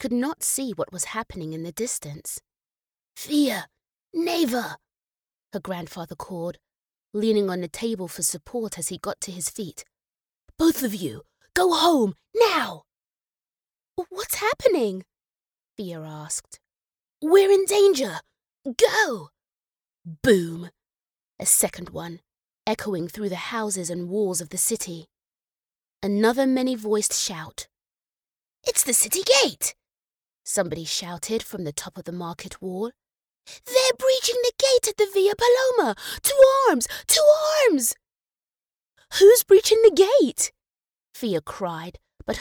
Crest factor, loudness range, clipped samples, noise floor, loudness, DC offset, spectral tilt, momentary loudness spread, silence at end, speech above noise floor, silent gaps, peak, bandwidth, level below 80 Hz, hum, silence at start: 20 dB; 10 LU; under 0.1%; under -90 dBFS; -22 LUFS; under 0.1%; -3 dB/octave; 19 LU; 0 s; over 68 dB; none; -4 dBFS; over 20 kHz; -58 dBFS; none; 0 s